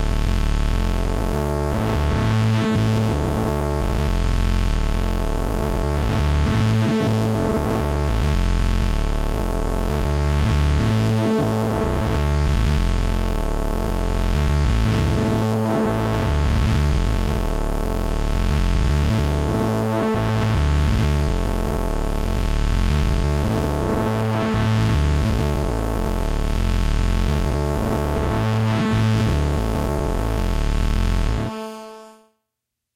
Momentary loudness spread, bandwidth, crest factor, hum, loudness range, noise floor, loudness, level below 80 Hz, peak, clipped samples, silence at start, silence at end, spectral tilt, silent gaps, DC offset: 5 LU; 16 kHz; 10 dB; none; 2 LU; -81 dBFS; -21 LUFS; -22 dBFS; -10 dBFS; under 0.1%; 0 s; 0.85 s; -6.5 dB/octave; none; under 0.1%